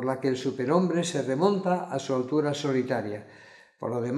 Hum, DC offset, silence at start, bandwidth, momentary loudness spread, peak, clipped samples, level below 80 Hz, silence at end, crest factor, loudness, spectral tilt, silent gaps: none; under 0.1%; 0 s; 12 kHz; 8 LU; -8 dBFS; under 0.1%; -76 dBFS; 0 s; 18 dB; -27 LUFS; -6 dB/octave; none